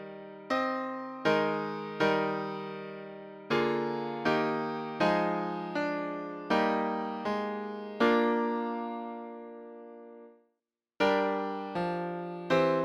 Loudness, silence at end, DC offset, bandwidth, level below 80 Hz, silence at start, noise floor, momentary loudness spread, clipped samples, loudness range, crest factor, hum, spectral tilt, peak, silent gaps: -31 LUFS; 0 s; under 0.1%; 13 kHz; -68 dBFS; 0 s; -85 dBFS; 17 LU; under 0.1%; 4 LU; 18 dB; none; -6.5 dB/octave; -14 dBFS; none